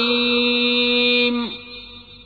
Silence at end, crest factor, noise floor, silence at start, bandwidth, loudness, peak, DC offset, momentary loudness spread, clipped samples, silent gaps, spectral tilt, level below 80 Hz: 0 s; 14 dB; -40 dBFS; 0 s; 4.9 kHz; -17 LUFS; -6 dBFS; under 0.1%; 18 LU; under 0.1%; none; -4.5 dB/octave; -52 dBFS